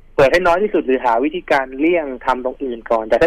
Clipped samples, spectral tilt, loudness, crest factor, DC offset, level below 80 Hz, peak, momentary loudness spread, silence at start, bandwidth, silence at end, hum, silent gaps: under 0.1%; -5.5 dB/octave; -17 LUFS; 10 dB; under 0.1%; -40 dBFS; -6 dBFS; 7 LU; 0.2 s; 15 kHz; 0 s; none; none